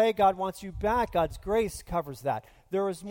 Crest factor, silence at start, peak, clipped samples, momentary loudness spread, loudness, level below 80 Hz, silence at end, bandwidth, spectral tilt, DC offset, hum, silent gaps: 16 dB; 0 s; -12 dBFS; under 0.1%; 9 LU; -29 LUFS; -46 dBFS; 0 s; 17 kHz; -5.5 dB/octave; under 0.1%; none; none